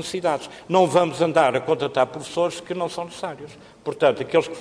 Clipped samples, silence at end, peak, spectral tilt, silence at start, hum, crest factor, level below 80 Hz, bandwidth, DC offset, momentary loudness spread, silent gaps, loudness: under 0.1%; 0 s; -4 dBFS; -5 dB/octave; 0 s; none; 18 dB; -62 dBFS; 11 kHz; under 0.1%; 14 LU; none; -22 LUFS